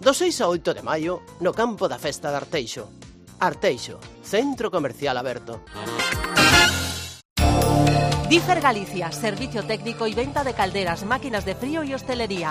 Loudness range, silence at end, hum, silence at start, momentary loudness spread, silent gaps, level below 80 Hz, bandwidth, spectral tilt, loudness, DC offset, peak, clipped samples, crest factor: 7 LU; 0 s; none; 0 s; 12 LU; 7.25-7.36 s; -38 dBFS; 15.5 kHz; -4 dB/octave; -22 LUFS; under 0.1%; -4 dBFS; under 0.1%; 18 dB